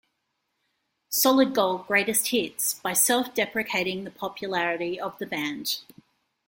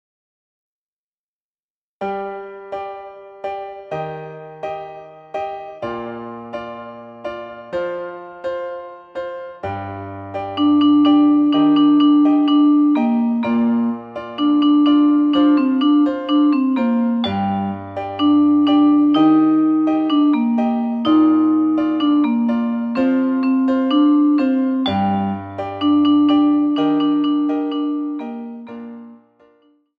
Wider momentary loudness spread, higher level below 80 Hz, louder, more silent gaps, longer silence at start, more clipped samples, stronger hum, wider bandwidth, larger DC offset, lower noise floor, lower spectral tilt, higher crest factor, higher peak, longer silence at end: second, 11 LU vs 17 LU; second, -68 dBFS vs -60 dBFS; second, -25 LUFS vs -16 LUFS; neither; second, 1.1 s vs 2 s; neither; neither; first, 17 kHz vs 5 kHz; neither; second, -78 dBFS vs under -90 dBFS; second, -2 dB/octave vs -8 dB/octave; first, 20 dB vs 12 dB; about the same, -6 dBFS vs -4 dBFS; second, 0.65 s vs 0.85 s